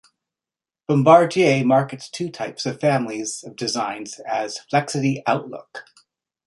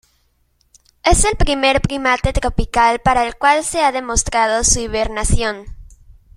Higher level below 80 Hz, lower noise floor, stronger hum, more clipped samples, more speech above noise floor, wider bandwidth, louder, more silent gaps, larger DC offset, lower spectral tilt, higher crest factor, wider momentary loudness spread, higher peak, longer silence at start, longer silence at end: second, -66 dBFS vs -26 dBFS; first, under -90 dBFS vs -61 dBFS; neither; neither; first, over 70 dB vs 45 dB; second, 11.5 kHz vs 16 kHz; second, -20 LUFS vs -16 LUFS; neither; neither; first, -5.5 dB/octave vs -3 dB/octave; about the same, 20 dB vs 16 dB; first, 18 LU vs 6 LU; about the same, -2 dBFS vs 0 dBFS; second, 0.9 s vs 1.05 s; about the same, 0.65 s vs 0.55 s